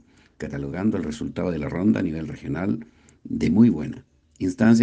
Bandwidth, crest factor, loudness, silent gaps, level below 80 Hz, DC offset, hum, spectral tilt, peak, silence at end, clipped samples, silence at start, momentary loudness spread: 8.6 kHz; 18 dB; -24 LUFS; none; -50 dBFS; under 0.1%; none; -7.5 dB/octave; -6 dBFS; 0 s; under 0.1%; 0.4 s; 15 LU